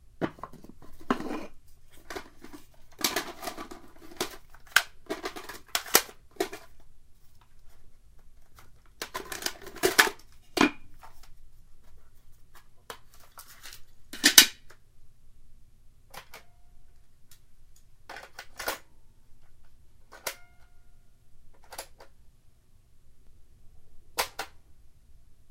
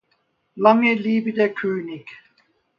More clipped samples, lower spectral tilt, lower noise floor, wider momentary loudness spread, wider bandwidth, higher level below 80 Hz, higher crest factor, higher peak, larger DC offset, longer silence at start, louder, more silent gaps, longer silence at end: neither; second, -0.5 dB/octave vs -7.5 dB/octave; second, -56 dBFS vs -68 dBFS; first, 26 LU vs 15 LU; first, 16 kHz vs 6 kHz; first, -54 dBFS vs -72 dBFS; first, 34 dB vs 22 dB; about the same, 0 dBFS vs 0 dBFS; neither; second, 0.05 s vs 0.55 s; second, -27 LUFS vs -19 LUFS; neither; second, 0 s vs 0.65 s